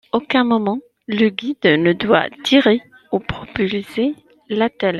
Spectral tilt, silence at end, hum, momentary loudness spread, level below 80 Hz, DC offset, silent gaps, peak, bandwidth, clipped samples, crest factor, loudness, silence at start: -6 dB/octave; 0 s; none; 11 LU; -50 dBFS; under 0.1%; none; -2 dBFS; 12 kHz; under 0.1%; 16 dB; -18 LUFS; 0.15 s